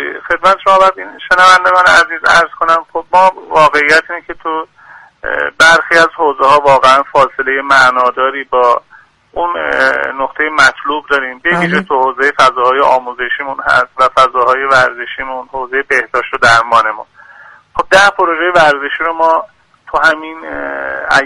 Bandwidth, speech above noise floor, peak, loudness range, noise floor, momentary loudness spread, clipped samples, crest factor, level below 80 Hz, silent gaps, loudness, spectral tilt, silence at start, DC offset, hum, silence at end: 13.5 kHz; 28 dB; 0 dBFS; 4 LU; -39 dBFS; 12 LU; 0.3%; 10 dB; -44 dBFS; none; -10 LUFS; -3 dB/octave; 0 s; under 0.1%; none; 0 s